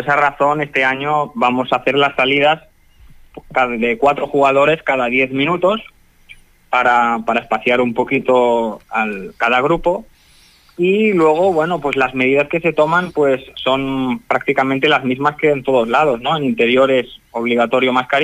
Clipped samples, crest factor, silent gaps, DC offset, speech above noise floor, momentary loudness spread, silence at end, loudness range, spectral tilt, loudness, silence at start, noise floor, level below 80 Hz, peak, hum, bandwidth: under 0.1%; 14 dB; none; under 0.1%; 34 dB; 6 LU; 0 s; 1 LU; -6 dB/octave; -15 LUFS; 0 s; -49 dBFS; -48 dBFS; -2 dBFS; none; 15 kHz